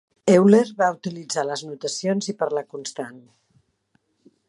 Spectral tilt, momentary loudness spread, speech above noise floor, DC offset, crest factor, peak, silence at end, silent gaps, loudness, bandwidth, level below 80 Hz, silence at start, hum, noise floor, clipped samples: -5.5 dB/octave; 17 LU; 47 dB; under 0.1%; 20 dB; -2 dBFS; 1.3 s; none; -21 LUFS; 11.5 kHz; -70 dBFS; 0.25 s; none; -68 dBFS; under 0.1%